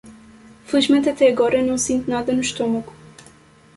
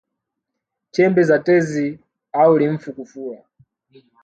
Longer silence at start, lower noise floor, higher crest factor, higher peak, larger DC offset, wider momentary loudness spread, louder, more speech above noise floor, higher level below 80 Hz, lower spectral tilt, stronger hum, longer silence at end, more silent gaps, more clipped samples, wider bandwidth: second, 0.05 s vs 0.95 s; second, -49 dBFS vs -80 dBFS; about the same, 16 dB vs 16 dB; about the same, -4 dBFS vs -4 dBFS; neither; second, 8 LU vs 18 LU; about the same, -19 LUFS vs -17 LUFS; second, 31 dB vs 63 dB; first, -52 dBFS vs -66 dBFS; second, -3.5 dB/octave vs -7.5 dB/octave; neither; about the same, 0.85 s vs 0.9 s; neither; neither; first, 11.5 kHz vs 8 kHz